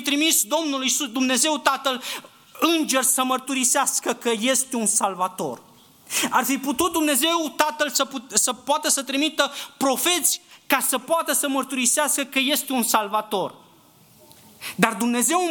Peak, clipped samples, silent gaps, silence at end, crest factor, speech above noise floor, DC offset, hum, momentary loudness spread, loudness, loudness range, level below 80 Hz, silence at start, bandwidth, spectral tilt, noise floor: 0 dBFS; under 0.1%; none; 0 s; 22 dB; 31 dB; under 0.1%; none; 8 LU; -21 LUFS; 2 LU; -68 dBFS; 0 s; 19 kHz; -1 dB/octave; -53 dBFS